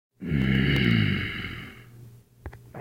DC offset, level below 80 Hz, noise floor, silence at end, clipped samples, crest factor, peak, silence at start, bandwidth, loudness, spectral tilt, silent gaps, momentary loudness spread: under 0.1%; -40 dBFS; -49 dBFS; 0 s; under 0.1%; 18 dB; -10 dBFS; 0.2 s; 16.5 kHz; -25 LUFS; -7 dB/octave; none; 23 LU